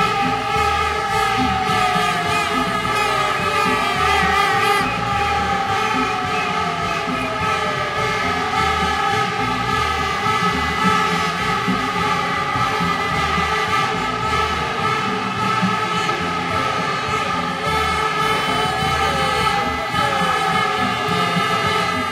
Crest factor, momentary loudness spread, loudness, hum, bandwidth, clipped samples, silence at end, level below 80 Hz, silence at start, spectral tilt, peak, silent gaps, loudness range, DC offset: 16 dB; 3 LU; -18 LUFS; none; 16.5 kHz; under 0.1%; 0 s; -40 dBFS; 0 s; -4 dB/octave; -4 dBFS; none; 2 LU; under 0.1%